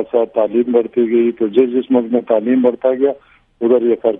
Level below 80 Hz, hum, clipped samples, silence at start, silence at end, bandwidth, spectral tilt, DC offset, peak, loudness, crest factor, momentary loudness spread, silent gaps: -60 dBFS; none; under 0.1%; 0 s; 0 s; 3.8 kHz; -10 dB/octave; under 0.1%; 0 dBFS; -15 LUFS; 14 dB; 3 LU; none